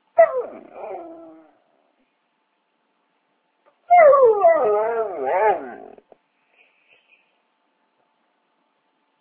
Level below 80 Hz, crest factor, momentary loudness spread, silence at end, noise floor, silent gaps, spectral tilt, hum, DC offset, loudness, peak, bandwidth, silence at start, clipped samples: -70 dBFS; 20 dB; 25 LU; 3.45 s; -70 dBFS; none; -7.5 dB/octave; none; under 0.1%; -17 LUFS; -2 dBFS; 3.6 kHz; 0.15 s; under 0.1%